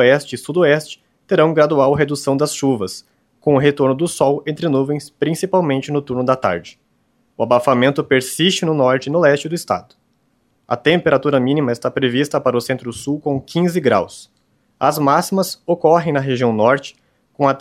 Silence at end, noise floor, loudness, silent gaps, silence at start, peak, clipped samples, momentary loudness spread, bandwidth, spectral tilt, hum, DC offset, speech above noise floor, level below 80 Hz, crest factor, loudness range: 0 s; -62 dBFS; -17 LUFS; none; 0 s; 0 dBFS; under 0.1%; 8 LU; 15.5 kHz; -5.5 dB/octave; none; under 0.1%; 46 dB; -56 dBFS; 16 dB; 2 LU